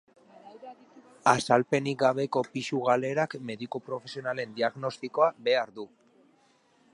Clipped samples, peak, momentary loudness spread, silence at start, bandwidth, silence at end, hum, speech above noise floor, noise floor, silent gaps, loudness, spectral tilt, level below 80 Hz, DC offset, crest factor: under 0.1%; -6 dBFS; 18 LU; 0.45 s; 11.5 kHz; 1.05 s; none; 37 dB; -65 dBFS; none; -28 LUFS; -5 dB/octave; -74 dBFS; under 0.1%; 24 dB